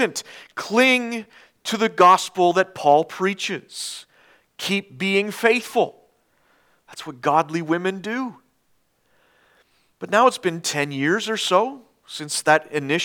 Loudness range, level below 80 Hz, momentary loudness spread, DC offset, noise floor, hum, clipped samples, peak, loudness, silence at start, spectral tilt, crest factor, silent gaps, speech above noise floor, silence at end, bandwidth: 8 LU; -76 dBFS; 16 LU; under 0.1%; -66 dBFS; none; under 0.1%; 0 dBFS; -20 LUFS; 0 s; -3.5 dB/octave; 22 dB; none; 45 dB; 0 s; 19 kHz